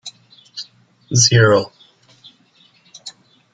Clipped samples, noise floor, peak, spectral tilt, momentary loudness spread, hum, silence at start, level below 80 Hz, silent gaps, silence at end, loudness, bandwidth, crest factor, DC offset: under 0.1%; -54 dBFS; 0 dBFS; -3.5 dB/octave; 25 LU; none; 0.05 s; -54 dBFS; none; 0.45 s; -13 LUFS; 9.4 kHz; 20 dB; under 0.1%